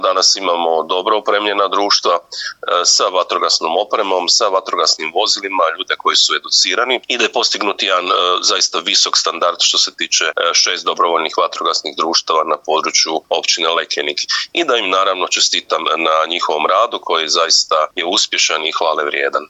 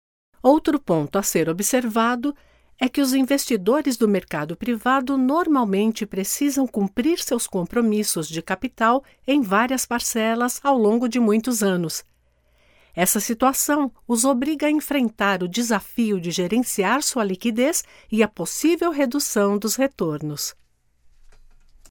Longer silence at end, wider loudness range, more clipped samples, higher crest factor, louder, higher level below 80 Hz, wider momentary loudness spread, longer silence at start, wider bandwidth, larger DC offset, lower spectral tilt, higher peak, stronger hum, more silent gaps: second, 0.05 s vs 1.4 s; about the same, 2 LU vs 2 LU; neither; about the same, 14 dB vs 18 dB; first, -14 LUFS vs -21 LUFS; second, -72 dBFS vs -54 dBFS; about the same, 5 LU vs 7 LU; second, 0 s vs 0.45 s; second, 11.5 kHz vs over 20 kHz; neither; second, 1 dB/octave vs -4 dB/octave; first, 0 dBFS vs -4 dBFS; neither; neither